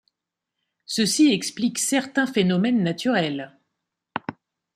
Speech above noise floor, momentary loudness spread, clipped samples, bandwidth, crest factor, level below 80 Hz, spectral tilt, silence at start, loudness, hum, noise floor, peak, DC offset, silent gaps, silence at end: 63 dB; 15 LU; under 0.1%; 15.5 kHz; 16 dB; -68 dBFS; -4 dB/octave; 0.9 s; -22 LUFS; none; -84 dBFS; -8 dBFS; under 0.1%; none; 0.45 s